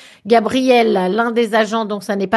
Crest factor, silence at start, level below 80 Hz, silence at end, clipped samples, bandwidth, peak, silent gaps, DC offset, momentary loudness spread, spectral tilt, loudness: 16 dB; 0.25 s; -60 dBFS; 0 s; under 0.1%; 12.5 kHz; 0 dBFS; none; under 0.1%; 8 LU; -5 dB/octave; -15 LUFS